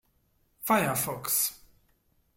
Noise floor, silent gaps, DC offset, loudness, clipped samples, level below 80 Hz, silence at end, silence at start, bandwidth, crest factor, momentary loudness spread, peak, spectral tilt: -70 dBFS; none; under 0.1%; -27 LUFS; under 0.1%; -66 dBFS; 0.8 s; 0.6 s; 16.5 kHz; 20 dB; 5 LU; -12 dBFS; -3 dB/octave